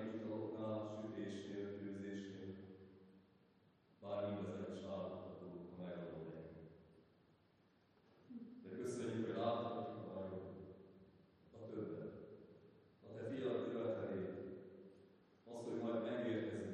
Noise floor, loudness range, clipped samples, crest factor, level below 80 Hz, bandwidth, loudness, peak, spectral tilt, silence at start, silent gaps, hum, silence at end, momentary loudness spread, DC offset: -74 dBFS; 7 LU; under 0.1%; 18 dB; -86 dBFS; 9.4 kHz; -47 LUFS; -30 dBFS; -7 dB/octave; 0 s; none; none; 0 s; 20 LU; under 0.1%